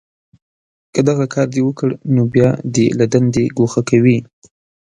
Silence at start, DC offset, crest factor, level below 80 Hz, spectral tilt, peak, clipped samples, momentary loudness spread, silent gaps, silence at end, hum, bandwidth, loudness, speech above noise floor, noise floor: 0.95 s; under 0.1%; 16 dB; -50 dBFS; -7 dB/octave; 0 dBFS; under 0.1%; 5 LU; none; 0.65 s; none; 10.5 kHz; -15 LUFS; over 76 dB; under -90 dBFS